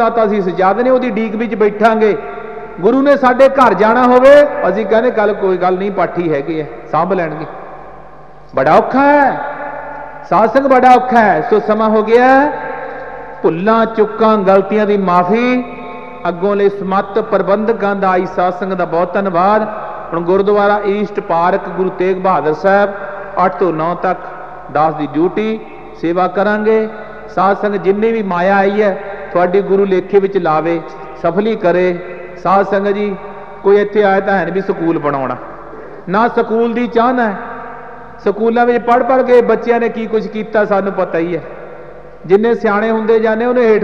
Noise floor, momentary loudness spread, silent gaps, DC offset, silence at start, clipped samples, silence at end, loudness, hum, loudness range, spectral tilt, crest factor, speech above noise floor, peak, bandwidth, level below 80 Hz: -37 dBFS; 15 LU; none; 2%; 0 s; under 0.1%; 0 s; -13 LUFS; none; 5 LU; -7.5 dB/octave; 12 dB; 26 dB; 0 dBFS; 8 kHz; -48 dBFS